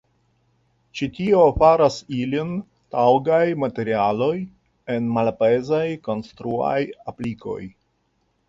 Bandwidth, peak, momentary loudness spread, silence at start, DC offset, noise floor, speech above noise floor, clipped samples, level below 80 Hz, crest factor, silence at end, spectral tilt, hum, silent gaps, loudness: 7.8 kHz; -4 dBFS; 15 LU; 0.95 s; under 0.1%; -68 dBFS; 48 dB; under 0.1%; -46 dBFS; 18 dB; 0.8 s; -7 dB/octave; none; none; -21 LUFS